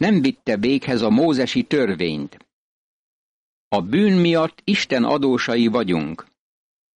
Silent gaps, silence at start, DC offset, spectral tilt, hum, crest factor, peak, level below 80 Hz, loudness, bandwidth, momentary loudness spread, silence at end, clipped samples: 2.53-3.71 s; 0 s; under 0.1%; -6 dB/octave; none; 12 dB; -8 dBFS; -56 dBFS; -19 LUFS; 10 kHz; 8 LU; 0.75 s; under 0.1%